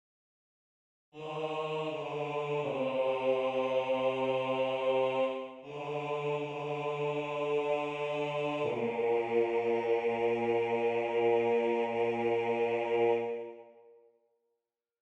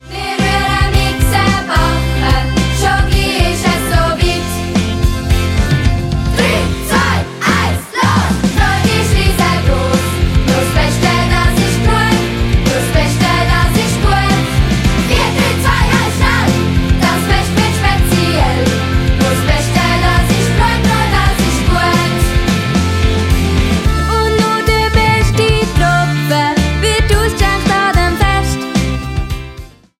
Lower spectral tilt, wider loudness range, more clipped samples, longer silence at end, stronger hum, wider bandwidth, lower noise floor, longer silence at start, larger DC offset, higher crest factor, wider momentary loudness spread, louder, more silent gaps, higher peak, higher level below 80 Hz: first, -6.5 dB/octave vs -5 dB/octave; about the same, 4 LU vs 2 LU; neither; first, 1.3 s vs 0.3 s; neither; second, 8.2 kHz vs 16.5 kHz; first, -86 dBFS vs -32 dBFS; first, 1.15 s vs 0.05 s; neither; about the same, 14 dB vs 12 dB; first, 7 LU vs 3 LU; second, -32 LUFS vs -12 LUFS; neither; second, -18 dBFS vs 0 dBFS; second, -74 dBFS vs -18 dBFS